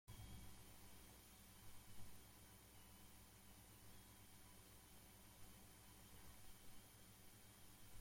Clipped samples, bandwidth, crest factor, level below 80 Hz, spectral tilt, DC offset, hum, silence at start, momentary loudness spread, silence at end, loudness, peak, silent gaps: under 0.1%; 16.5 kHz; 18 dB; -70 dBFS; -3.5 dB/octave; under 0.1%; 60 Hz at -75 dBFS; 0.05 s; 2 LU; 0 s; -64 LUFS; -44 dBFS; none